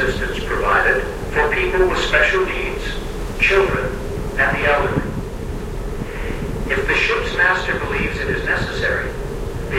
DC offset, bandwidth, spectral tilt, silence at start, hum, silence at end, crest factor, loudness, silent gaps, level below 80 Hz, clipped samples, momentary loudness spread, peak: under 0.1%; 16 kHz; -5 dB/octave; 0 s; none; 0 s; 18 dB; -19 LUFS; none; -28 dBFS; under 0.1%; 12 LU; -2 dBFS